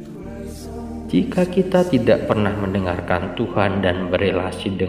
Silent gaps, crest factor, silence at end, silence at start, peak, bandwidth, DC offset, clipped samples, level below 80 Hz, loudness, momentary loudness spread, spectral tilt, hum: none; 20 dB; 0 s; 0 s; 0 dBFS; 14.5 kHz; 0.1%; under 0.1%; -42 dBFS; -20 LUFS; 15 LU; -7 dB/octave; none